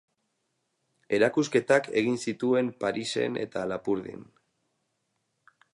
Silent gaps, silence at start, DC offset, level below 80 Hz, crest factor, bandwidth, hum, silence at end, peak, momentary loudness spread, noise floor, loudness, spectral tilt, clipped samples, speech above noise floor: none; 1.1 s; under 0.1%; -70 dBFS; 22 dB; 11.5 kHz; none; 1.55 s; -8 dBFS; 8 LU; -78 dBFS; -27 LUFS; -5 dB/octave; under 0.1%; 51 dB